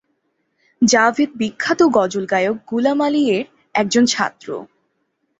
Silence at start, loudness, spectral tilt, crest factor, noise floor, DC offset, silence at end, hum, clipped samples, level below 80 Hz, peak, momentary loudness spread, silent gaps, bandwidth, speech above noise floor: 0.8 s; -17 LUFS; -3.5 dB/octave; 18 dB; -69 dBFS; under 0.1%; 0.75 s; none; under 0.1%; -60 dBFS; 0 dBFS; 9 LU; none; 8.2 kHz; 52 dB